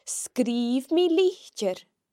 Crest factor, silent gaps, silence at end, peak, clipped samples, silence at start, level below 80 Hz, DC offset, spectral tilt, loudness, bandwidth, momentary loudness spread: 14 dB; none; 0.3 s; -12 dBFS; under 0.1%; 0.05 s; -82 dBFS; under 0.1%; -3.5 dB/octave; -25 LUFS; 16 kHz; 9 LU